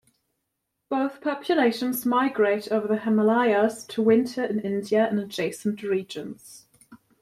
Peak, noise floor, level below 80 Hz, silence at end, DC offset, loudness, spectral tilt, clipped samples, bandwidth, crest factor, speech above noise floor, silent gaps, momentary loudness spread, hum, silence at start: -8 dBFS; -80 dBFS; -68 dBFS; 0.25 s; under 0.1%; -24 LUFS; -5.5 dB/octave; under 0.1%; 15 kHz; 16 dB; 56 dB; none; 9 LU; none; 0.9 s